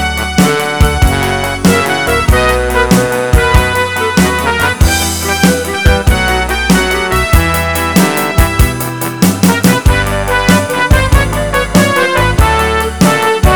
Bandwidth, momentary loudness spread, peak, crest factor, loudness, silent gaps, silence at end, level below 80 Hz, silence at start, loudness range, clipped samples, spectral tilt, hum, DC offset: over 20 kHz; 3 LU; 0 dBFS; 10 dB; -10 LUFS; none; 0 s; -16 dBFS; 0 s; 1 LU; 0.8%; -4.5 dB/octave; none; 0.9%